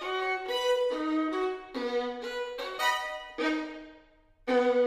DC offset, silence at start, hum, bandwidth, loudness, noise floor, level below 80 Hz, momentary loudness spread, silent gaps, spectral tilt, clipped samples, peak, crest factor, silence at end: under 0.1%; 0 s; none; 15.5 kHz; -31 LUFS; -60 dBFS; -64 dBFS; 8 LU; none; -2 dB/octave; under 0.1%; -14 dBFS; 16 dB; 0 s